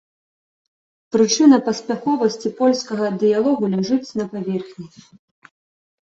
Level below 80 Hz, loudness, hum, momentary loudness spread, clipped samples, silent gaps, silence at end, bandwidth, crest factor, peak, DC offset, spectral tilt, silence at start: -64 dBFS; -19 LUFS; none; 13 LU; under 0.1%; none; 1.15 s; 8 kHz; 18 dB; -2 dBFS; under 0.1%; -5 dB/octave; 1.15 s